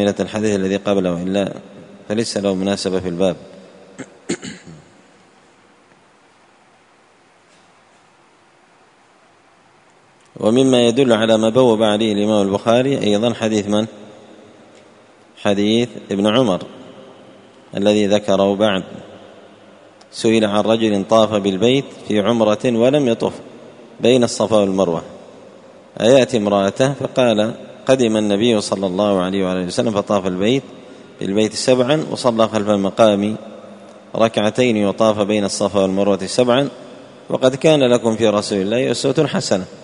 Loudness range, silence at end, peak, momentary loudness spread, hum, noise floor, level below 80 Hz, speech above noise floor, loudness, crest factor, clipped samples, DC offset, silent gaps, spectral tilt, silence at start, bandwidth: 6 LU; 0 s; 0 dBFS; 12 LU; none; -52 dBFS; -56 dBFS; 36 dB; -17 LUFS; 18 dB; under 0.1%; under 0.1%; none; -5.5 dB/octave; 0 s; 11 kHz